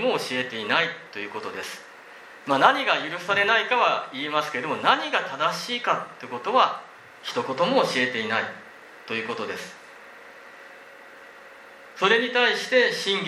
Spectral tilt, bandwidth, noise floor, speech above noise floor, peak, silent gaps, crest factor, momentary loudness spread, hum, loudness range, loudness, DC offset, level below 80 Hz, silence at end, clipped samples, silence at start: -3 dB/octave; 14 kHz; -46 dBFS; 22 dB; -2 dBFS; none; 24 dB; 24 LU; none; 9 LU; -23 LUFS; under 0.1%; -76 dBFS; 0 s; under 0.1%; 0 s